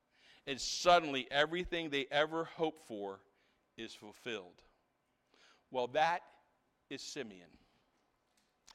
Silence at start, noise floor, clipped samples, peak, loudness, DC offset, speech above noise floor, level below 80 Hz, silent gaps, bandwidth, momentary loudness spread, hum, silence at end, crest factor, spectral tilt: 0.45 s; -79 dBFS; under 0.1%; -16 dBFS; -36 LUFS; under 0.1%; 43 dB; -66 dBFS; none; 15 kHz; 19 LU; none; 1.3 s; 24 dB; -3 dB/octave